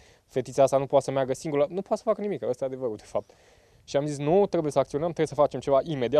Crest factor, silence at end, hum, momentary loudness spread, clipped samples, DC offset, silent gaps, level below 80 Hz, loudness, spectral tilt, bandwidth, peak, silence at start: 18 dB; 0 s; none; 10 LU; under 0.1%; under 0.1%; none; -60 dBFS; -26 LUFS; -6.5 dB/octave; 12.5 kHz; -8 dBFS; 0.35 s